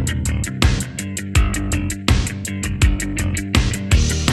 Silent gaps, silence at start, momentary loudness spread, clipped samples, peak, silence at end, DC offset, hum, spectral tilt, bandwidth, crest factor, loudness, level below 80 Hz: none; 0 s; 6 LU; under 0.1%; 0 dBFS; 0 s; under 0.1%; none; -4.5 dB/octave; 13 kHz; 18 dB; -20 LUFS; -22 dBFS